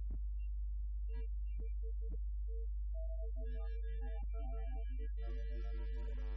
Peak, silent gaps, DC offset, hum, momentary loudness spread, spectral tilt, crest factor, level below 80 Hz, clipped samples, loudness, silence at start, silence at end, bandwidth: -34 dBFS; none; under 0.1%; none; 0 LU; -8 dB/octave; 6 dB; -40 dBFS; under 0.1%; -45 LUFS; 0 s; 0 s; 3.5 kHz